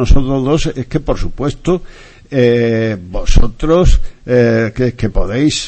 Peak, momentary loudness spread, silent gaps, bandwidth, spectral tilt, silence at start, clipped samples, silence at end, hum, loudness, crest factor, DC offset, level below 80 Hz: 0 dBFS; 8 LU; none; 8.6 kHz; -6 dB/octave; 0 s; under 0.1%; 0 s; none; -15 LUFS; 12 dB; under 0.1%; -16 dBFS